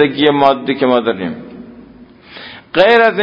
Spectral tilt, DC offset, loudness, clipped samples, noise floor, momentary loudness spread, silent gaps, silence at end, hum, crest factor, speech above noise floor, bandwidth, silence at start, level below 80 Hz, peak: -7 dB/octave; under 0.1%; -13 LUFS; 0.1%; -40 dBFS; 23 LU; none; 0 s; none; 14 dB; 28 dB; 7 kHz; 0 s; -52 dBFS; 0 dBFS